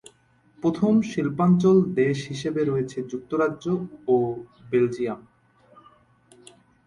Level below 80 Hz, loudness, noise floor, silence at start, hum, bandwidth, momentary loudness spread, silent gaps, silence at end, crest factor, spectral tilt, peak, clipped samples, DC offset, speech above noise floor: -60 dBFS; -24 LUFS; -60 dBFS; 0.65 s; none; 11.5 kHz; 11 LU; none; 1.65 s; 16 dB; -7.5 dB/octave; -8 dBFS; under 0.1%; under 0.1%; 37 dB